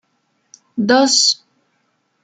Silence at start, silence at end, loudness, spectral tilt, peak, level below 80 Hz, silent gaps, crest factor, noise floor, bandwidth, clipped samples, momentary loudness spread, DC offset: 0.75 s; 0.9 s; -14 LUFS; -2 dB/octave; 0 dBFS; -66 dBFS; none; 18 dB; -66 dBFS; 9.6 kHz; under 0.1%; 13 LU; under 0.1%